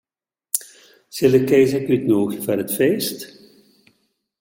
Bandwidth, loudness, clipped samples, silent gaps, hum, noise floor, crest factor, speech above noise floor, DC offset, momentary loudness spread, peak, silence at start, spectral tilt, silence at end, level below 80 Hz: 17 kHz; -19 LUFS; under 0.1%; none; none; -89 dBFS; 20 dB; 72 dB; under 0.1%; 13 LU; 0 dBFS; 0.55 s; -5 dB/octave; 1.15 s; -60 dBFS